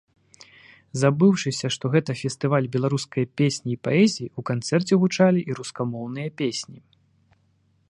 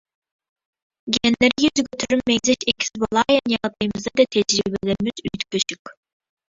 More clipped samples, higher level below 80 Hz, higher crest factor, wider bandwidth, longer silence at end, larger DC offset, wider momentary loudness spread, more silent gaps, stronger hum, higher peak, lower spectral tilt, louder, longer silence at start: neither; second, -66 dBFS vs -52 dBFS; about the same, 18 dB vs 20 dB; first, 11 kHz vs 8 kHz; first, 1.15 s vs 0.6 s; neither; first, 12 LU vs 8 LU; second, none vs 5.79-5.85 s; neither; second, -6 dBFS vs -2 dBFS; first, -6 dB/octave vs -3.5 dB/octave; second, -23 LUFS vs -20 LUFS; about the same, 0.95 s vs 1.05 s